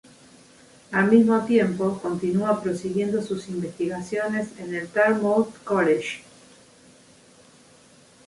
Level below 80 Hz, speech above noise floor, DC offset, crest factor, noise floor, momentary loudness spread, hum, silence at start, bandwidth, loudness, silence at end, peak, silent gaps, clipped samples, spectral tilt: -64 dBFS; 31 dB; under 0.1%; 20 dB; -53 dBFS; 11 LU; none; 0.9 s; 11.5 kHz; -23 LUFS; 2.05 s; -4 dBFS; none; under 0.1%; -6.5 dB/octave